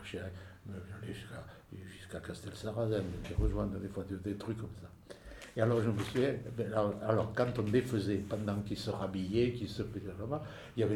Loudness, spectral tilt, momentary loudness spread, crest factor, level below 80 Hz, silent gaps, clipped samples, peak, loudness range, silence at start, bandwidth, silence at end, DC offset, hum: -36 LUFS; -7 dB/octave; 17 LU; 22 dB; -50 dBFS; none; under 0.1%; -14 dBFS; 6 LU; 0 s; 15.5 kHz; 0 s; under 0.1%; none